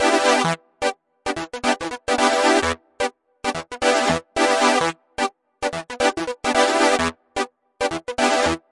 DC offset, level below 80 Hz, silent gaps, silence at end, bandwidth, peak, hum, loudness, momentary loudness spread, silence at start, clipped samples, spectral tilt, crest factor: under 0.1%; -50 dBFS; none; 0.15 s; 11.5 kHz; -2 dBFS; none; -21 LUFS; 11 LU; 0 s; under 0.1%; -3 dB/octave; 18 dB